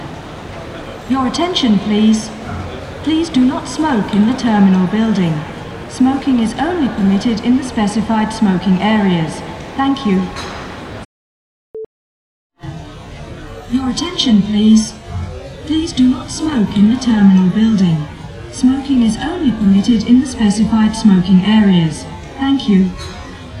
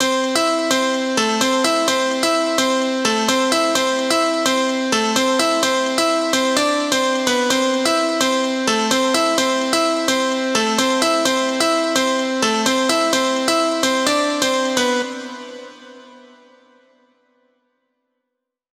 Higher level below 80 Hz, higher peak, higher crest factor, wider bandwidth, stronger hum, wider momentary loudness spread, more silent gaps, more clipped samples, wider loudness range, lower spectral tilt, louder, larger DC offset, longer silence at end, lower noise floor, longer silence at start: first, -36 dBFS vs -64 dBFS; about the same, 0 dBFS vs -2 dBFS; about the same, 14 dB vs 18 dB; second, 11 kHz vs 17 kHz; neither; first, 18 LU vs 2 LU; first, 11.05-11.74 s, 11.86-12.50 s vs none; neither; first, 9 LU vs 4 LU; first, -6 dB/octave vs -1.5 dB/octave; first, -14 LUFS vs -17 LUFS; neither; second, 0 s vs 2.55 s; first, under -90 dBFS vs -79 dBFS; about the same, 0 s vs 0 s